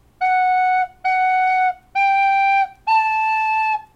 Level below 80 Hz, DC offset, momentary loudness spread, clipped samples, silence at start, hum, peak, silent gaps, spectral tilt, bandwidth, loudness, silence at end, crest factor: -56 dBFS; under 0.1%; 4 LU; under 0.1%; 0.2 s; none; -8 dBFS; none; -1.5 dB/octave; 8 kHz; -17 LUFS; 0.15 s; 10 dB